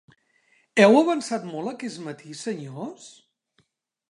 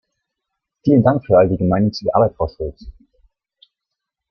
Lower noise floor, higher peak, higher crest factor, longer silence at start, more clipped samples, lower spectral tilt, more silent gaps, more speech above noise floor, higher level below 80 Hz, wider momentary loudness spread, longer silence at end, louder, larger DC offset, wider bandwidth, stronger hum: second, -72 dBFS vs -81 dBFS; about the same, -2 dBFS vs 0 dBFS; first, 24 dB vs 18 dB; about the same, 0.75 s vs 0.85 s; neither; second, -5 dB/octave vs -9 dB/octave; neither; second, 49 dB vs 66 dB; second, -78 dBFS vs -42 dBFS; first, 20 LU vs 10 LU; second, 1 s vs 1.4 s; second, -23 LUFS vs -16 LUFS; neither; first, 11.5 kHz vs 6.4 kHz; neither